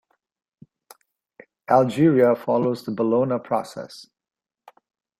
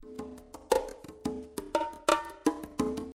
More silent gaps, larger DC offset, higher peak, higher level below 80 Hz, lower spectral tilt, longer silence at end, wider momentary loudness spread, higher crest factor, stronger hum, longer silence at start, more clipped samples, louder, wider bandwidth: neither; neither; first, -4 dBFS vs -10 dBFS; second, -66 dBFS vs -56 dBFS; first, -7.5 dB/octave vs -4 dB/octave; first, 1.15 s vs 0.05 s; first, 21 LU vs 15 LU; about the same, 20 dB vs 24 dB; neither; first, 1.7 s vs 0 s; neither; first, -21 LUFS vs -32 LUFS; about the same, 15.5 kHz vs 16.5 kHz